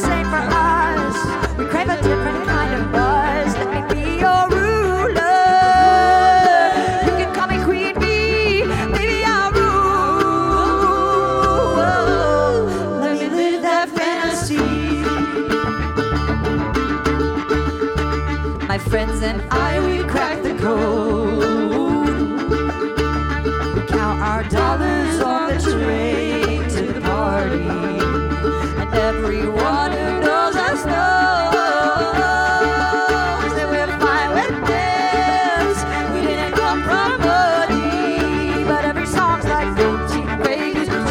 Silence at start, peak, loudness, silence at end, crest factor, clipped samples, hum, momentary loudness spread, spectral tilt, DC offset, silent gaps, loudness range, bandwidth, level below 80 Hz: 0 s; -2 dBFS; -17 LUFS; 0 s; 14 dB; under 0.1%; none; 5 LU; -5.5 dB/octave; under 0.1%; none; 5 LU; 16.5 kHz; -28 dBFS